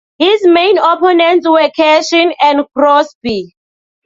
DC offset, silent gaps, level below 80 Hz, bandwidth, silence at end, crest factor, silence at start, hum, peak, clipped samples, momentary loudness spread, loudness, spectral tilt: under 0.1%; 3.15-3.21 s; -52 dBFS; 7.8 kHz; 0.6 s; 10 dB; 0.2 s; none; 0 dBFS; under 0.1%; 7 LU; -10 LUFS; -3.5 dB/octave